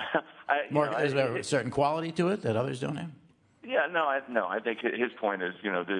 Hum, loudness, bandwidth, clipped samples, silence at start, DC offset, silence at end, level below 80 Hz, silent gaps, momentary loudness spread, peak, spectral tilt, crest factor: none; -30 LUFS; 11 kHz; under 0.1%; 0 s; under 0.1%; 0 s; -70 dBFS; none; 6 LU; -10 dBFS; -5.5 dB/octave; 18 dB